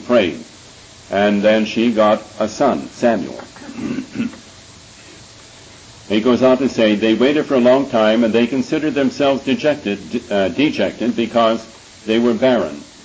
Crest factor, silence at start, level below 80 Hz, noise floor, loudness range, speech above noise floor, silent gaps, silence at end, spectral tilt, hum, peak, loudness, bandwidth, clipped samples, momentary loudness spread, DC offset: 16 dB; 0 s; -52 dBFS; -41 dBFS; 7 LU; 25 dB; none; 0.2 s; -5.5 dB/octave; none; -2 dBFS; -16 LUFS; 8 kHz; under 0.1%; 12 LU; under 0.1%